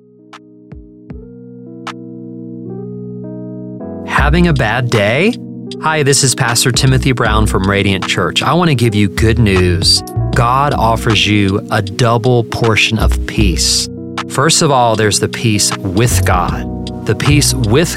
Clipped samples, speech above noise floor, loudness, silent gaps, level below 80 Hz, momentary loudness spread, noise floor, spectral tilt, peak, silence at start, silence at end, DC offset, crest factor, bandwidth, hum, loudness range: under 0.1%; 27 dB; -12 LUFS; none; -24 dBFS; 16 LU; -39 dBFS; -4 dB/octave; 0 dBFS; 0.35 s; 0 s; under 0.1%; 12 dB; 16.5 kHz; none; 7 LU